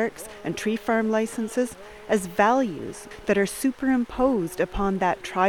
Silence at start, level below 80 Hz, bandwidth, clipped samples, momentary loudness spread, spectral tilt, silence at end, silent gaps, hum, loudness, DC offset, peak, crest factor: 0 s; -46 dBFS; 18.5 kHz; under 0.1%; 11 LU; -5 dB/octave; 0 s; none; none; -25 LUFS; 0.2%; -4 dBFS; 20 dB